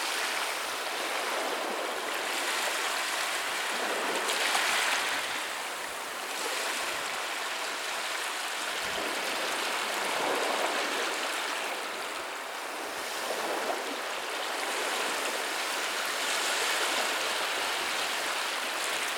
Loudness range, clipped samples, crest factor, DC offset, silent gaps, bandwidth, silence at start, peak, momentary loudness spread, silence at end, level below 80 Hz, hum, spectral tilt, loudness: 4 LU; under 0.1%; 18 dB; under 0.1%; none; 19 kHz; 0 s; -12 dBFS; 6 LU; 0 s; -76 dBFS; none; 0.5 dB/octave; -30 LUFS